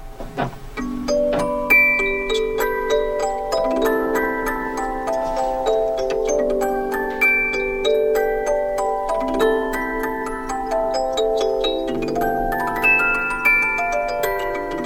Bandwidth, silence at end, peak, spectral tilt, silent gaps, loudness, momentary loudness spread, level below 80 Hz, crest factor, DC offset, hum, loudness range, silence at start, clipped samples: 16.5 kHz; 0 s; -4 dBFS; -4 dB/octave; none; -20 LUFS; 9 LU; -36 dBFS; 16 dB; under 0.1%; none; 3 LU; 0 s; under 0.1%